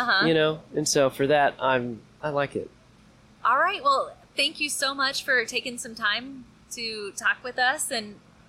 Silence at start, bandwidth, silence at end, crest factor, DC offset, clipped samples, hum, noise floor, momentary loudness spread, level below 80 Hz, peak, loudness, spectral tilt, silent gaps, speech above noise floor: 0 s; 16 kHz; 0.35 s; 14 dB; under 0.1%; under 0.1%; none; -55 dBFS; 12 LU; -62 dBFS; -12 dBFS; -25 LUFS; -2.5 dB/octave; none; 30 dB